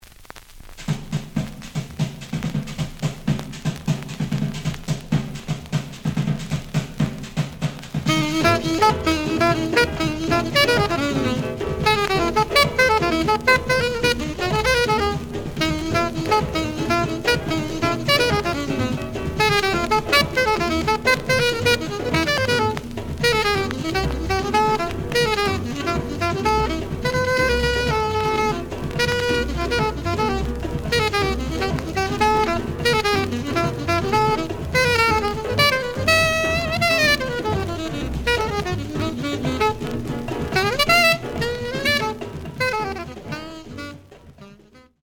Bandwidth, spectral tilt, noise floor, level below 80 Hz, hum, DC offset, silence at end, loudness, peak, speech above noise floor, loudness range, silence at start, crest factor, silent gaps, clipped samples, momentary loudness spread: over 20 kHz; -4.5 dB/octave; -50 dBFS; -36 dBFS; none; under 0.1%; 0.25 s; -21 LUFS; -4 dBFS; 31 dB; 7 LU; 0.05 s; 18 dB; none; under 0.1%; 10 LU